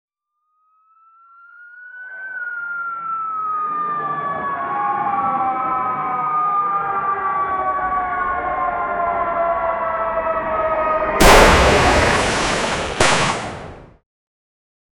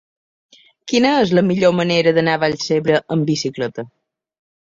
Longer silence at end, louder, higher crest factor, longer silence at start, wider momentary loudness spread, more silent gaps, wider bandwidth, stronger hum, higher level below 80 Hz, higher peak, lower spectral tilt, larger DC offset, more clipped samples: first, 1.15 s vs 0.9 s; about the same, -18 LUFS vs -17 LUFS; about the same, 18 dB vs 16 dB; first, 1.55 s vs 0.85 s; about the same, 12 LU vs 11 LU; neither; first, over 20 kHz vs 7.8 kHz; neither; first, -32 dBFS vs -56 dBFS; about the same, 0 dBFS vs -2 dBFS; second, -3.5 dB/octave vs -5.5 dB/octave; neither; neither